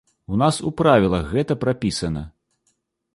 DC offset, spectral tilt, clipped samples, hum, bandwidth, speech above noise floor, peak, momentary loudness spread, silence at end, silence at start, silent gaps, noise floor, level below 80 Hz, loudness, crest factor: under 0.1%; -6 dB/octave; under 0.1%; none; 11.5 kHz; 50 dB; -2 dBFS; 11 LU; 0.85 s; 0.3 s; none; -70 dBFS; -42 dBFS; -21 LUFS; 20 dB